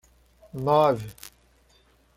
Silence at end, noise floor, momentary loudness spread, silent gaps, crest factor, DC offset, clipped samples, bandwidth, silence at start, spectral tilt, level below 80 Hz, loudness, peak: 0.9 s; -61 dBFS; 25 LU; none; 20 dB; under 0.1%; under 0.1%; 16.5 kHz; 0.55 s; -6.5 dB/octave; -58 dBFS; -23 LUFS; -8 dBFS